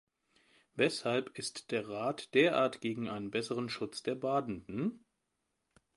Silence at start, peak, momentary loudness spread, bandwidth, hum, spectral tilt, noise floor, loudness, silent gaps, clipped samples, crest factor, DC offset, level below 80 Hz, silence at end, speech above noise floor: 0.75 s; -14 dBFS; 10 LU; 11.5 kHz; none; -4.5 dB/octave; -84 dBFS; -34 LUFS; none; under 0.1%; 22 dB; under 0.1%; -72 dBFS; 1 s; 49 dB